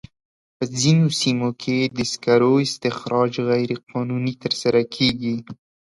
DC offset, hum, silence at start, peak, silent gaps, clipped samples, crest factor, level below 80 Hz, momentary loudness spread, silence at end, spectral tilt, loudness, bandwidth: under 0.1%; none; 0.6 s; -4 dBFS; 3.83-3.87 s; under 0.1%; 18 dB; -56 dBFS; 9 LU; 0.45 s; -5 dB/octave; -21 LUFS; 11.5 kHz